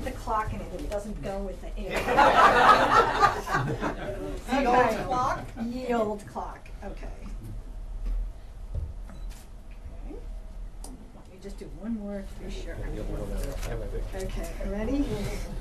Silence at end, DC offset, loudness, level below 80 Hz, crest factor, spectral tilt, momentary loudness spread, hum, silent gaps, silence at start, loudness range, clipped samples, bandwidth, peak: 0 s; under 0.1%; -27 LUFS; -36 dBFS; 20 dB; -5 dB/octave; 23 LU; none; none; 0 s; 19 LU; under 0.1%; 13.5 kHz; -8 dBFS